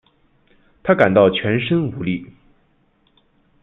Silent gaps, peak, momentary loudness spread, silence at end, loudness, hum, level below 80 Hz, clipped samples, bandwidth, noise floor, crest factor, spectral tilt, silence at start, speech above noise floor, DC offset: none; -2 dBFS; 13 LU; 1.4 s; -17 LUFS; none; -54 dBFS; under 0.1%; 4.1 kHz; -60 dBFS; 18 dB; -9 dB/octave; 0.85 s; 44 dB; under 0.1%